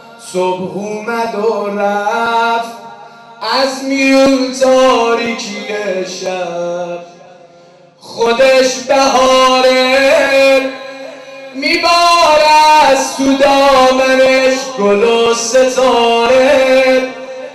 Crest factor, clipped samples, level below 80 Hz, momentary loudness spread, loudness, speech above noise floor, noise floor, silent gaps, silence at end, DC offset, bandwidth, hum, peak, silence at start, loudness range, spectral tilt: 8 dB; under 0.1%; -46 dBFS; 14 LU; -11 LUFS; 31 dB; -42 dBFS; none; 0 s; under 0.1%; 14 kHz; none; -2 dBFS; 0.05 s; 7 LU; -2.5 dB/octave